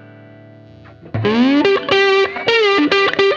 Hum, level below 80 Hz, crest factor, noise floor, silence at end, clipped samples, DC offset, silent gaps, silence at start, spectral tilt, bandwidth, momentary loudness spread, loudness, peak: none; -52 dBFS; 14 dB; -40 dBFS; 0 s; under 0.1%; under 0.1%; none; 1.05 s; -5 dB/octave; 7.4 kHz; 5 LU; -14 LUFS; -2 dBFS